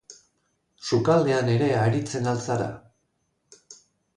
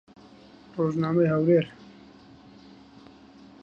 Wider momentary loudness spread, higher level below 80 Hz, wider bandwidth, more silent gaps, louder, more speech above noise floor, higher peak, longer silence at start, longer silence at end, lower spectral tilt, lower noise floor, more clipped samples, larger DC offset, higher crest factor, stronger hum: about the same, 12 LU vs 14 LU; about the same, -60 dBFS vs -64 dBFS; first, 10.5 kHz vs 7 kHz; neither; about the same, -24 LUFS vs -24 LUFS; first, 51 dB vs 28 dB; about the same, -8 dBFS vs -10 dBFS; second, 0.1 s vs 0.75 s; second, 0.4 s vs 1.95 s; second, -6.5 dB/octave vs -9 dB/octave; first, -73 dBFS vs -51 dBFS; neither; neither; about the same, 18 dB vs 18 dB; neither